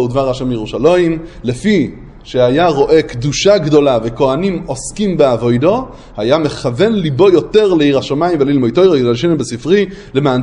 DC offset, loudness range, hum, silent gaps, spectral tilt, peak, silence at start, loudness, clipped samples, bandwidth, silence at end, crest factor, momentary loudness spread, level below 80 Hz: under 0.1%; 2 LU; none; none; -6 dB/octave; 0 dBFS; 0 s; -13 LUFS; under 0.1%; 11 kHz; 0 s; 12 dB; 8 LU; -38 dBFS